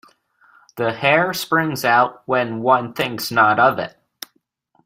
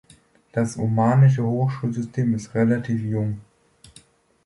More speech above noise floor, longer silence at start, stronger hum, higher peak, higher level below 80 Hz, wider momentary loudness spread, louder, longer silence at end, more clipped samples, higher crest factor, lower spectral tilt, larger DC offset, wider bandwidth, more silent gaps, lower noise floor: first, 47 dB vs 34 dB; first, 0.75 s vs 0.55 s; neither; first, -2 dBFS vs -8 dBFS; second, -62 dBFS vs -56 dBFS; first, 21 LU vs 10 LU; first, -18 LUFS vs -22 LUFS; about the same, 0.95 s vs 1.05 s; neither; about the same, 18 dB vs 16 dB; second, -4.5 dB/octave vs -8.5 dB/octave; neither; first, 16 kHz vs 11.5 kHz; neither; first, -65 dBFS vs -55 dBFS